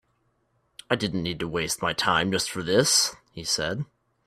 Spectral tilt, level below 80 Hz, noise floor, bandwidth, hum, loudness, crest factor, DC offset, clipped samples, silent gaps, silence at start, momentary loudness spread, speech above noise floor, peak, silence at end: -2.5 dB/octave; -56 dBFS; -70 dBFS; 15.5 kHz; none; -25 LUFS; 22 dB; under 0.1%; under 0.1%; none; 0.9 s; 10 LU; 45 dB; -6 dBFS; 0.4 s